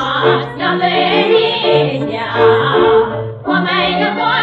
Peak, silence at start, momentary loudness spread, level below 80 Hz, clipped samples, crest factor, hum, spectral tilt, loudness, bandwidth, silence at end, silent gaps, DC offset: 0 dBFS; 0 s; 6 LU; -46 dBFS; under 0.1%; 12 dB; none; -7 dB/octave; -13 LUFS; 5.8 kHz; 0 s; none; under 0.1%